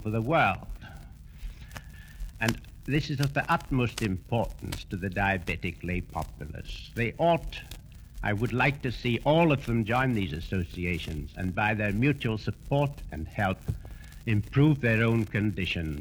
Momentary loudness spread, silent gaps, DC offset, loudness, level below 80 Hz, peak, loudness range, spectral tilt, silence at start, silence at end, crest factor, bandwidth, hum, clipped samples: 20 LU; none; under 0.1%; -28 LUFS; -44 dBFS; -6 dBFS; 4 LU; -6.5 dB/octave; 0 s; 0 s; 22 dB; over 20 kHz; none; under 0.1%